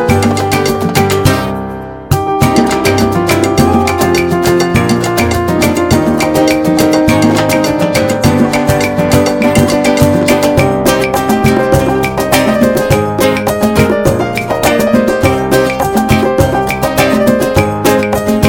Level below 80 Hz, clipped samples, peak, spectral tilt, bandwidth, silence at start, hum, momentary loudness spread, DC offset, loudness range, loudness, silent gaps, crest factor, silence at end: -30 dBFS; 0.8%; 0 dBFS; -5.5 dB/octave; over 20 kHz; 0 s; none; 3 LU; under 0.1%; 1 LU; -10 LUFS; none; 10 dB; 0 s